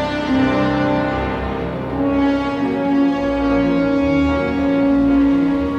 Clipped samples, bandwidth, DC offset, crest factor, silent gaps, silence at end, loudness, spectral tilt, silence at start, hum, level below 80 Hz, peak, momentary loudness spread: under 0.1%; 6.8 kHz; under 0.1%; 10 dB; none; 0 s; -17 LUFS; -7.5 dB/octave; 0 s; none; -34 dBFS; -6 dBFS; 6 LU